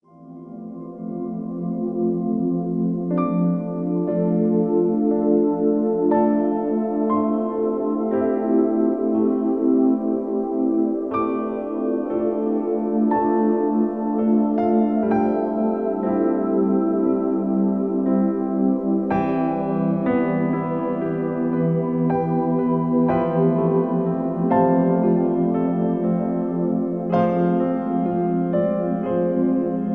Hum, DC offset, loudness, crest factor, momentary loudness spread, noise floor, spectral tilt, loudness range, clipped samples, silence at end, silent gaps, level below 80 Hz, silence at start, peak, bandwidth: none; 0.2%; -21 LUFS; 14 dB; 5 LU; -41 dBFS; -12 dB/octave; 2 LU; under 0.1%; 0 s; none; -56 dBFS; 0.2 s; -6 dBFS; 3.8 kHz